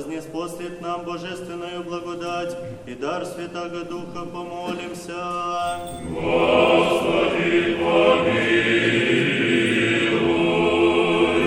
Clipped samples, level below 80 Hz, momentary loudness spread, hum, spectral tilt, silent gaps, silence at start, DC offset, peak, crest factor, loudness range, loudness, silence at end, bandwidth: under 0.1%; -50 dBFS; 14 LU; none; -5 dB/octave; none; 0 s; under 0.1%; -4 dBFS; 18 dB; 12 LU; -21 LUFS; 0 s; 16 kHz